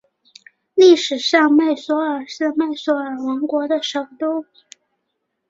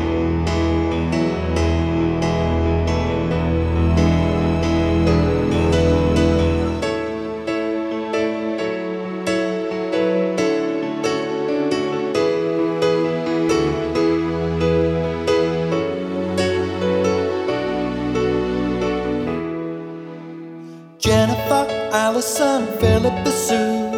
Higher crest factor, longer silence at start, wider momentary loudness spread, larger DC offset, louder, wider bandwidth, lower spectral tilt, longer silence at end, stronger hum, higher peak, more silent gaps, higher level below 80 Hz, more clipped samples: about the same, 16 dB vs 18 dB; first, 0.75 s vs 0 s; first, 12 LU vs 7 LU; neither; about the same, -18 LUFS vs -20 LUFS; second, 7.8 kHz vs 16 kHz; second, -2.5 dB/octave vs -6 dB/octave; first, 1.05 s vs 0 s; neither; about the same, -2 dBFS vs -2 dBFS; neither; second, -68 dBFS vs -32 dBFS; neither